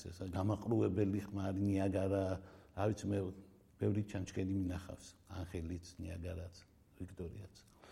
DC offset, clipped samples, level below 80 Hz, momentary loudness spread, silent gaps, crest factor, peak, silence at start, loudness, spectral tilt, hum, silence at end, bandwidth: under 0.1%; under 0.1%; -60 dBFS; 17 LU; none; 18 dB; -22 dBFS; 0 s; -40 LUFS; -7.5 dB/octave; none; 0 s; 12.5 kHz